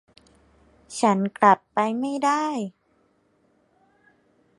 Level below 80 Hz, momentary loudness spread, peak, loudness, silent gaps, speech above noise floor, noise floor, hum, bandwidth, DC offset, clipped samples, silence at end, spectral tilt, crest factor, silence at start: -70 dBFS; 13 LU; -2 dBFS; -22 LUFS; none; 43 dB; -65 dBFS; none; 11.5 kHz; under 0.1%; under 0.1%; 1.9 s; -5 dB/octave; 24 dB; 0.9 s